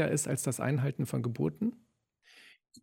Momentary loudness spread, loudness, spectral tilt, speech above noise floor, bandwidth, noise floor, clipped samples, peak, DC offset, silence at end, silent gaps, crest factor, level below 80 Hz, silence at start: 4 LU; -33 LUFS; -6 dB/octave; 36 dB; 17 kHz; -67 dBFS; under 0.1%; -16 dBFS; under 0.1%; 0.05 s; none; 18 dB; -68 dBFS; 0 s